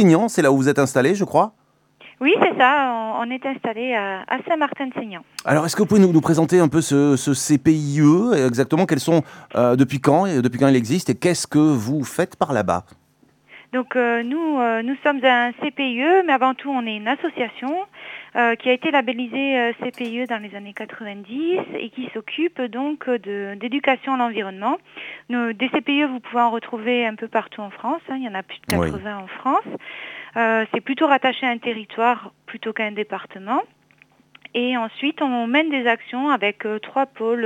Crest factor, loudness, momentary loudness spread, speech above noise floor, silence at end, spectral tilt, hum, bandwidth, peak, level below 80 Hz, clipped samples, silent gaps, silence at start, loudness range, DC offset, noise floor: 20 dB; -20 LUFS; 12 LU; 35 dB; 0 s; -5.5 dB/octave; none; 17.5 kHz; 0 dBFS; -58 dBFS; under 0.1%; none; 0 s; 7 LU; under 0.1%; -55 dBFS